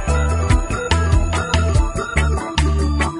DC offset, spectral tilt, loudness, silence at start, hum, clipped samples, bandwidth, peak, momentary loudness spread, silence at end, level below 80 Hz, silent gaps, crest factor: under 0.1%; -5.5 dB/octave; -18 LUFS; 0 s; none; under 0.1%; 11 kHz; -2 dBFS; 3 LU; 0 s; -20 dBFS; none; 14 dB